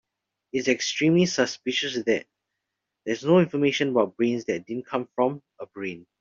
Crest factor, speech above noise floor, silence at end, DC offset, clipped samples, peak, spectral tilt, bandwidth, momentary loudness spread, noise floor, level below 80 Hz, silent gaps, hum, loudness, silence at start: 20 dB; 59 dB; 0.2 s; under 0.1%; under 0.1%; -6 dBFS; -5 dB/octave; 7.6 kHz; 14 LU; -83 dBFS; -68 dBFS; none; none; -25 LUFS; 0.55 s